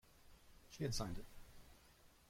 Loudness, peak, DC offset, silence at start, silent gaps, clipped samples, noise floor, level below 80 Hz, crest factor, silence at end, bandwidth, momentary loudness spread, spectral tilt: -46 LUFS; -30 dBFS; under 0.1%; 0.05 s; none; under 0.1%; -68 dBFS; -58 dBFS; 20 dB; 0.05 s; 16.5 kHz; 24 LU; -4.5 dB/octave